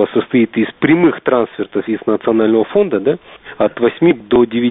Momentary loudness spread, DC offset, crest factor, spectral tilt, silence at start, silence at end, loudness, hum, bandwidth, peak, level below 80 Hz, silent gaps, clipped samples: 7 LU; under 0.1%; 14 dB; -5.5 dB/octave; 0 s; 0 s; -14 LUFS; none; 4 kHz; 0 dBFS; -50 dBFS; none; under 0.1%